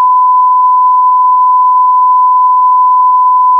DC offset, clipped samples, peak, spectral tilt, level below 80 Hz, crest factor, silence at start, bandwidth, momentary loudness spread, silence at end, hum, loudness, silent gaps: under 0.1%; under 0.1%; -2 dBFS; -4 dB/octave; under -90 dBFS; 4 dB; 0 s; 1.2 kHz; 0 LU; 0 s; none; -7 LUFS; none